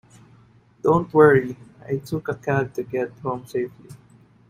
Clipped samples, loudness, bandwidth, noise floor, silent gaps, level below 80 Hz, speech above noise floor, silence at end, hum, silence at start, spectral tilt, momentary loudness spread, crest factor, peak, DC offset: under 0.1%; -22 LUFS; 14.5 kHz; -54 dBFS; none; -56 dBFS; 32 dB; 0.55 s; none; 0.85 s; -8 dB/octave; 15 LU; 20 dB; -2 dBFS; under 0.1%